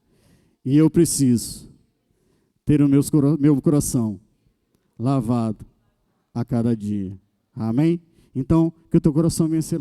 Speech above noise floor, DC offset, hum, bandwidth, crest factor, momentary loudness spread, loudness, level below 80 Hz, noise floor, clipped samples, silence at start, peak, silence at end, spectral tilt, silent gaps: 48 dB; under 0.1%; none; 15.5 kHz; 16 dB; 16 LU; -20 LUFS; -46 dBFS; -67 dBFS; under 0.1%; 0.65 s; -4 dBFS; 0 s; -7 dB/octave; none